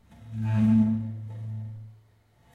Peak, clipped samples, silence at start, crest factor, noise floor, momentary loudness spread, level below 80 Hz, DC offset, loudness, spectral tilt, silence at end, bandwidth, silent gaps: -12 dBFS; under 0.1%; 0.1 s; 14 dB; -61 dBFS; 19 LU; -58 dBFS; under 0.1%; -27 LUFS; -10 dB/octave; 0.6 s; 4.2 kHz; none